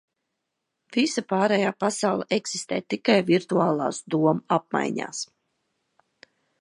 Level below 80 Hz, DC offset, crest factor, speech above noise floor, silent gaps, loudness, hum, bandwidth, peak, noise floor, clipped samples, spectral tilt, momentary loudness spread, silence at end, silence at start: -74 dBFS; under 0.1%; 22 dB; 57 dB; none; -24 LUFS; none; 11.5 kHz; -4 dBFS; -81 dBFS; under 0.1%; -4.5 dB/octave; 8 LU; 1.35 s; 0.9 s